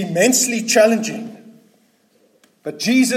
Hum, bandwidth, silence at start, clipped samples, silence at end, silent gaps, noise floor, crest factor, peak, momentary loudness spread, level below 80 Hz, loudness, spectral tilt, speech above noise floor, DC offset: none; 16.5 kHz; 0 s; under 0.1%; 0 s; none; -58 dBFS; 16 dB; -2 dBFS; 19 LU; -70 dBFS; -16 LUFS; -3 dB/octave; 42 dB; under 0.1%